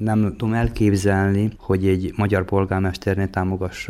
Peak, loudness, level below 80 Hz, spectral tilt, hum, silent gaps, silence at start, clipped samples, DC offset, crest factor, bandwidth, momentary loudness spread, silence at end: -6 dBFS; -21 LUFS; -38 dBFS; -7.5 dB/octave; none; none; 0 s; under 0.1%; under 0.1%; 14 dB; 13 kHz; 4 LU; 0 s